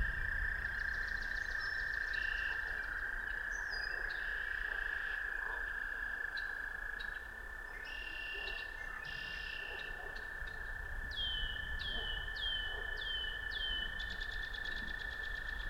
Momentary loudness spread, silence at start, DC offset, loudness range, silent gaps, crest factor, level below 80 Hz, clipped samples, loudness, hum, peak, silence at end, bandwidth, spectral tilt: 7 LU; 0 s; under 0.1%; 5 LU; none; 16 dB; -48 dBFS; under 0.1%; -40 LUFS; none; -24 dBFS; 0 s; 16.5 kHz; -2.5 dB/octave